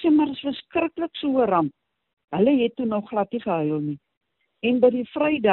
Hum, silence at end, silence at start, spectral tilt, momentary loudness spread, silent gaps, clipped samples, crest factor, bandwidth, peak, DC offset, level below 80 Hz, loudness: none; 0 s; 0 s; -5 dB/octave; 9 LU; 2.13-2.17 s, 2.24-2.28 s, 4.17-4.21 s; under 0.1%; 16 dB; 4.3 kHz; -6 dBFS; under 0.1%; -62 dBFS; -23 LUFS